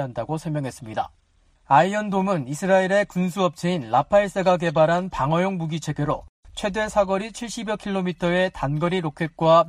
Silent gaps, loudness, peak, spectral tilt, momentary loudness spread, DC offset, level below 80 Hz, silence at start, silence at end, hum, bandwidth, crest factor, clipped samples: 6.29-6.43 s; -23 LUFS; -4 dBFS; -6 dB/octave; 11 LU; under 0.1%; -50 dBFS; 0 s; 0 s; none; 15 kHz; 18 dB; under 0.1%